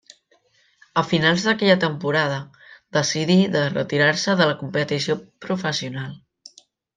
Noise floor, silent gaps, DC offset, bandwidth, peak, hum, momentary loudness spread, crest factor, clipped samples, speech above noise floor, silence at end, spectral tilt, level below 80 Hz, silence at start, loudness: -62 dBFS; none; under 0.1%; 9.4 kHz; -4 dBFS; none; 11 LU; 18 dB; under 0.1%; 41 dB; 0.8 s; -4.5 dB/octave; -64 dBFS; 0.95 s; -21 LUFS